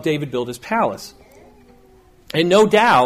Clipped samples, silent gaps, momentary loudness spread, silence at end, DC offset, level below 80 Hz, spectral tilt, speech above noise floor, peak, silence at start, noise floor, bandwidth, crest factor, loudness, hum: under 0.1%; none; 15 LU; 0 s; under 0.1%; -54 dBFS; -5 dB/octave; 33 dB; -4 dBFS; 0 s; -50 dBFS; 15.5 kHz; 16 dB; -17 LUFS; none